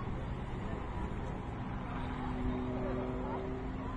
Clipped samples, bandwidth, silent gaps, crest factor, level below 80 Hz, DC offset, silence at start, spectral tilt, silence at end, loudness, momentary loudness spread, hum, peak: under 0.1%; 9.6 kHz; none; 12 dB; -44 dBFS; under 0.1%; 0 s; -8.5 dB/octave; 0 s; -39 LUFS; 4 LU; none; -26 dBFS